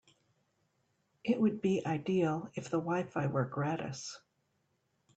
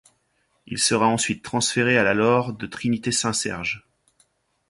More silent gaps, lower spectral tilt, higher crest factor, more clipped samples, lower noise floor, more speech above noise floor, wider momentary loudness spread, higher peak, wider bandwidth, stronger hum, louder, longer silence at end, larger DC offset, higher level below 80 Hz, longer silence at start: neither; first, -6.5 dB/octave vs -3.5 dB/octave; about the same, 18 dB vs 18 dB; neither; first, -78 dBFS vs -69 dBFS; about the same, 45 dB vs 46 dB; about the same, 11 LU vs 10 LU; second, -18 dBFS vs -6 dBFS; second, 8.8 kHz vs 11.5 kHz; neither; second, -34 LUFS vs -22 LUFS; about the same, 1 s vs 0.9 s; neither; second, -74 dBFS vs -56 dBFS; first, 1.25 s vs 0.7 s